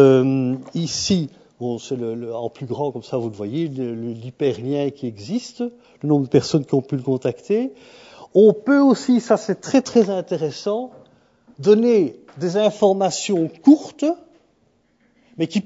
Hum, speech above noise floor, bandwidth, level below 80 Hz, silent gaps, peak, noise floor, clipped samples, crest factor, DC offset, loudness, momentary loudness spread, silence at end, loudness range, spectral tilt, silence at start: none; 43 dB; 8 kHz; -62 dBFS; none; 0 dBFS; -62 dBFS; under 0.1%; 20 dB; under 0.1%; -20 LUFS; 14 LU; 0.05 s; 7 LU; -6 dB/octave; 0 s